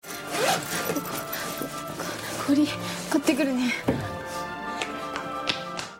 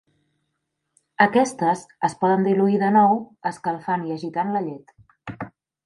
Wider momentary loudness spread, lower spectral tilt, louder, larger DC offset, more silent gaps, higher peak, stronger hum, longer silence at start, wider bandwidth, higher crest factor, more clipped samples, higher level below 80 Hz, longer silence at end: second, 9 LU vs 19 LU; second, -3.5 dB/octave vs -6.5 dB/octave; second, -28 LUFS vs -21 LUFS; neither; neither; second, -6 dBFS vs -2 dBFS; neither; second, 0.05 s vs 1.2 s; first, 16.5 kHz vs 11.5 kHz; about the same, 22 dB vs 20 dB; neither; first, -56 dBFS vs -66 dBFS; second, 0 s vs 0.35 s